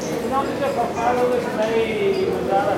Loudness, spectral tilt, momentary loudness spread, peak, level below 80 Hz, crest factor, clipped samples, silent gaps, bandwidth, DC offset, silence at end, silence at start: -21 LUFS; -5.5 dB/octave; 3 LU; -6 dBFS; -50 dBFS; 14 dB; under 0.1%; none; 16.5 kHz; under 0.1%; 0 s; 0 s